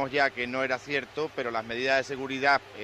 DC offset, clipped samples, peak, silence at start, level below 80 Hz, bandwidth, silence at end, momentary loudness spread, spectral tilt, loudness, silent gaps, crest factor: under 0.1%; under 0.1%; -10 dBFS; 0 s; -64 dBFS; 13 kHz; 0 s; 7 LU; -4 dB/octave; -28 LUFS; none; 18 dB